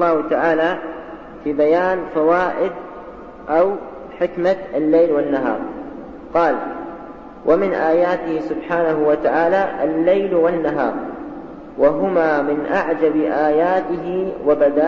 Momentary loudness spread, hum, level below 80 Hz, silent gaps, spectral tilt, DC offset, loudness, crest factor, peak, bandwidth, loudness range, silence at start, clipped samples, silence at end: 17 LU; none; -50 dBFS; none; -8 dB/octave; 0.3%; -18 LUFS; 14 dB; -4 dBFS; 6.8 kHz; 2 LU; 0 s; under 0.1%; 0 s